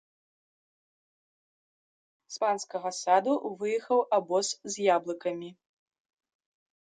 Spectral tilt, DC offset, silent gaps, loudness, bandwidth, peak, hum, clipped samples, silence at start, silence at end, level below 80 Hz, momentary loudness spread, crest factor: -3 dB/octave; under 0.1%; none; -29 LUFS; 9.6 kHz; -10 dBFS; none; under 0.1%; 2.3 s; 1.4 s; -84 dBFS; 9 LU; 22 dB